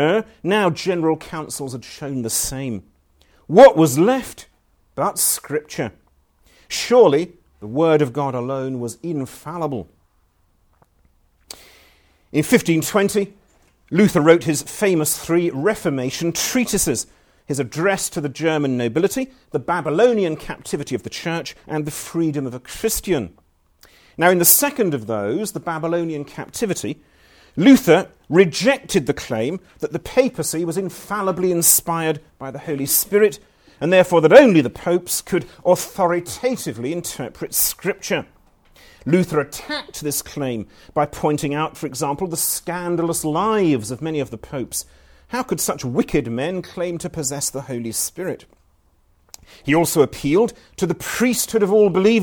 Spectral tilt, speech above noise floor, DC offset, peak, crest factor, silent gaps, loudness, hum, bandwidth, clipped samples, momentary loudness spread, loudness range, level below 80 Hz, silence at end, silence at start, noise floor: -4.5 dB/octave; 42 dB; under 0.1%; 0 dBFS; 20 dB; none; -19 LUFS; none; over 20 kHz; under 0.1%; 14 LU; 8 LU; -50 dBFS; 0 s; 0 s; -61 dBFS